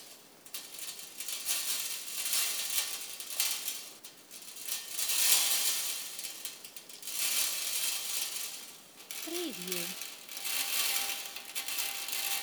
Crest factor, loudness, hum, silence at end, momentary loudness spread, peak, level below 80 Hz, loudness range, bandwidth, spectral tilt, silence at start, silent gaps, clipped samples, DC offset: 26 dB; -32 LUFS; none; 0 s; 16 LU; -10 dBFS; under -90 dBFS; 4 LU; over 20 kHz; 1.5 dB/octave; 0 s; none; under 0.1%; under 0.1%